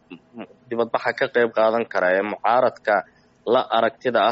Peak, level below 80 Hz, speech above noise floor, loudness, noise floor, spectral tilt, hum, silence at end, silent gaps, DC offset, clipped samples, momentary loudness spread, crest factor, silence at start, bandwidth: -6 dBFS; -68 dBFS; 21 dB; -21 LUFS; -41 dBFS; -2 dB/octave; none; 0 s; none; under 0.1%; under 0.1%; 12 LU; 16 dB; 0.1 s; 7.6 kHz